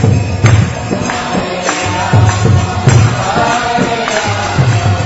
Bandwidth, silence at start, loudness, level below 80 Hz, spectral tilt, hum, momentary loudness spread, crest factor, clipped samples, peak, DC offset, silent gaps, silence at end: 8 kHz; 0 s; -12 LUFS; -30 dBFS; -5.5 dB/octave; none; 6 LU; 10 dB; 0.1%; 0 dBFS; under 0.1%; none; 0 s